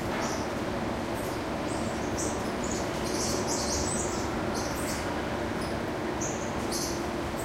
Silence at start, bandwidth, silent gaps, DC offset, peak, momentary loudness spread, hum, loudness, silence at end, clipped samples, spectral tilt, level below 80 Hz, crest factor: 0 s; 16 kHz; none; under 0.1%; -16 dBFS; 4 LU; none; -31 LUFS; 0 s; under 0.1%; -4 dB/octave; -44 dBFS; 14 dB